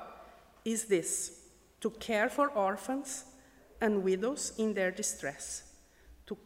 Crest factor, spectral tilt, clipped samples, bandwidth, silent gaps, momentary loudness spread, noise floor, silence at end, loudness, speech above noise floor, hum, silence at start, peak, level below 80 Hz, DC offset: 18 dB; -3.5 dB/octave; under 0.1%; 16 kHz; none; 12 LU; -59 dBFS; 0.1 s; -33 LUFS; 26 dB; none; 0 s; -16 dBFS; -64 dBFS; under 0.1%